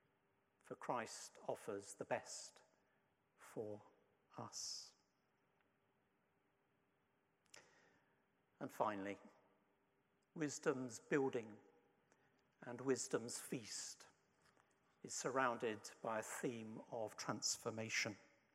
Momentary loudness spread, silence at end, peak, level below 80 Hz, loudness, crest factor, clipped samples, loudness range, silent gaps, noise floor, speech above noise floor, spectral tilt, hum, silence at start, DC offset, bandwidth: 18 LU; 0.3 s; -24 dBFS; under -90 dBFS; -46 LUFS; 24 dB; under 0.1%; 10 LU; none; -83 dBFS; 37 dB; -3 dB/octave; none; 0.65 s; under 0.1%; 16 kHz